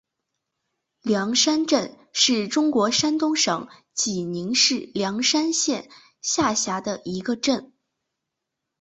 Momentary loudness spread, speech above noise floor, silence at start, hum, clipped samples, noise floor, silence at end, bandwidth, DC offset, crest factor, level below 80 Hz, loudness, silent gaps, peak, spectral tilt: 10 LU; 60 dB; 1.05 s; none; under 0.1%; -83 dBFS; 1.15 s; 8.4 kHz; under 0.1%; 18 dB; -62 dBFS; -22 LUFS; none; -6 dBFS; -2.5 dB/octave